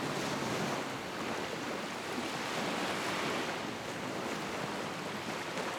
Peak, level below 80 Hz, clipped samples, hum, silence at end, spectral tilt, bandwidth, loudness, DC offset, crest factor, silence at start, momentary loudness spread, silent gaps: -22 dBFS; -68 dBFS; under 0.1%; none; 0 s; -3.5 dB/octave; over 20 kHz; -36 LUFS; under 0.1%; 14 dB; 0 s; 4 LU; none